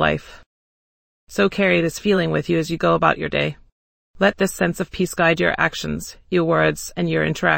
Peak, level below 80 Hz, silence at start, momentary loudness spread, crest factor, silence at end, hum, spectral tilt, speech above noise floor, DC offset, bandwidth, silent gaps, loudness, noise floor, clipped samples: -2 dBFS; -46 dBFS; 0 s; 8 LU; 20 dB; 0 s; none; -5 dB/octave; over 70 dB; under 0.1%; 17 kHz; 0.46-1.27 s, 3.72-4.14 s; -20 LUFS; under -90 dBFS; under 0.1%